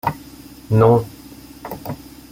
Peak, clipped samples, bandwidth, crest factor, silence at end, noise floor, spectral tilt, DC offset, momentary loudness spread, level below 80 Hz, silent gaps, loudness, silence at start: -2 dBFS; under 0.1%; 16.5 kHz; 18 dB; 0.35 s; -40 dBFS; -8 dB/octave; under 0.1%; 26 LU; -46 dBFS; none; -17 LUFS; 0.05 s